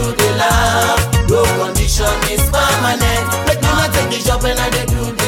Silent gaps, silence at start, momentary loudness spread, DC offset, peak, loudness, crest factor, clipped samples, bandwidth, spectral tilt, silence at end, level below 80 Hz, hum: none; 0 s; 3 LU; under 0.1%; 0 dBFS; -14 LUFS; 14 dB; under 0.1%; 18 kHz; -4 dB/octave; 0 s; -22 dBFS; none